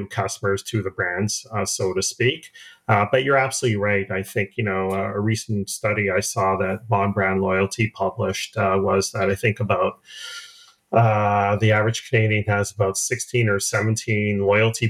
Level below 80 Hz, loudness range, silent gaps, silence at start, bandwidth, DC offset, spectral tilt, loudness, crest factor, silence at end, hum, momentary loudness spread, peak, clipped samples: -58 dBFS; 2 LU; none; 0 s; 15 kHz; under 0.1%; -4.5 dB/octave; -21 LUFS; 18 dB; 0 s; none; 6 LU; -4 dBFS; under 0.1%